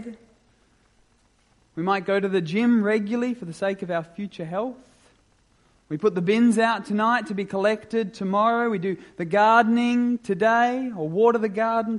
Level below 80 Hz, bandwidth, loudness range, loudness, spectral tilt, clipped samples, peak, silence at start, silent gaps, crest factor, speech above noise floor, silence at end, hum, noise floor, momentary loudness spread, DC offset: -66 dBFS; 11.5 kHz; 5 LU; -23 LUFS; -6.5 dB/octave; under 0.1%; -4 dBFS; 0 s; none; 18 dB; 40 dB; 0 s; none; -62 dBFS; 11 LU; under 0.1%